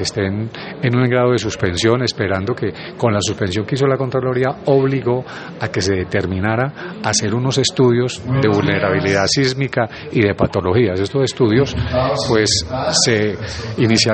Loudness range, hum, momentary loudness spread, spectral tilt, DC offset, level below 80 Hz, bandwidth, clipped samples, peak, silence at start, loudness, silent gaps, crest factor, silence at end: 2 LU; none; 7 LU; -5 dB/octave; under 0.1%; -44 dBFS; 8.8 kHz; under 0.1%; 0 dBFS; 0 s; -17 LUFS; none; 16 dB; 0 s